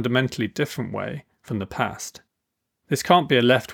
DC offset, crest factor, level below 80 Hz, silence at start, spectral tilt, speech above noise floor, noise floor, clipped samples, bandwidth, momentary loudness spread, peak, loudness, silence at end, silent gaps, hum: under 0.1%; 22 dB; -60 dBFS; 0 s; -5 dB/octave; 58 dB; -80 dBFS; under 0.1%; 18.5 kHz; 16 LU; -2 dBFS; -23 LUFS; 0 s; none; none